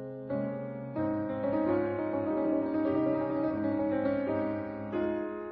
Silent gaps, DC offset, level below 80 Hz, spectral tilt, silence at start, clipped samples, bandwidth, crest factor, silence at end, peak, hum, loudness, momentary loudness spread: none; under 0.1%; -62 dBFS; -11.5 dB/octave; 0 s; under 0.1%; 4.8 kHz; 14 dB; 0 s; -18 dBFS; none; -32 LUFS; 6 LU